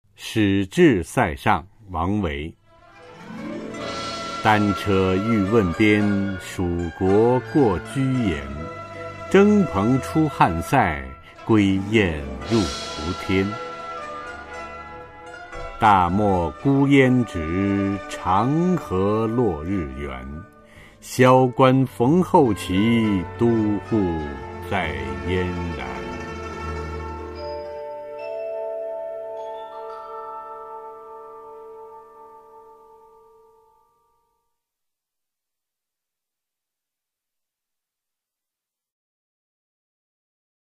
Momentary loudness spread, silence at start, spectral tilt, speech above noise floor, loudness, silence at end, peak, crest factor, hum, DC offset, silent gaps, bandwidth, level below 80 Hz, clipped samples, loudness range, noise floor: 18 LU; 0.2 s; -6.5 dB/octave; 68 dB; -21 LUFS; 8.2 s; -2 dBFS; 20 dB; none; under 0.1%; none; 15 kHz; -44 dBFS; under 0.1%; 13 LU; -87 dBFS